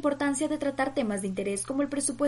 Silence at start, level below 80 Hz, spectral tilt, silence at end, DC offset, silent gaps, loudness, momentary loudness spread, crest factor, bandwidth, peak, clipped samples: 0 s; -58 dBFS; -4 dB/octave; 0 s; under 0.1%; none; -29 LUFS; 3 LU; 14 dB; 11.5 kHz; -14 dBFS; under 0.1%